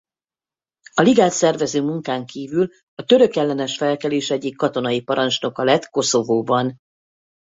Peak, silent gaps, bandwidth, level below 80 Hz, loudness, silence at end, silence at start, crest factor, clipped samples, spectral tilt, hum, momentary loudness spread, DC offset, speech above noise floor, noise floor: -2 dBFS; 2.83-2.97 s; 8 kHz; -62 dBFS; -19 LUFS; 0.8 s; 0.95 s; 18 dB; under 0.1%; -4.5 dB/octave; none; 10 LU; under 0.1%; over 71 dB; under -90 dBFS